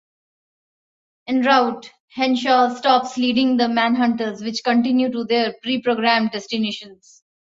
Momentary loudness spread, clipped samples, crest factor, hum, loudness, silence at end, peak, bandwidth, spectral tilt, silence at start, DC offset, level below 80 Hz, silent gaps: 8 LU; under 0.1%; 18 dB; none; -19 LUFS; 0.65 s; -2 dBFS; 7.8 kHz; -4.5 dB/octave; 1.3 s; under 0.1%; -66 dBFS; 2.00-2.08 s